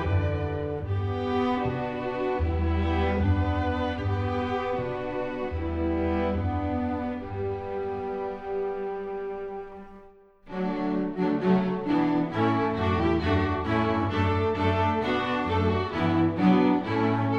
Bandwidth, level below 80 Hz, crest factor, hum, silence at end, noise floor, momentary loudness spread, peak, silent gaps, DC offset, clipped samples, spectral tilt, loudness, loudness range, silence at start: 7 kHz; -40 dBFS; 18 dB; none; 0 s; -52 dBFS; 8 LU; -10 dBFS; none; under 0.1%; under 0.1%; -8.5 dB/octave; -27 LUFS; 7 LU; 0 s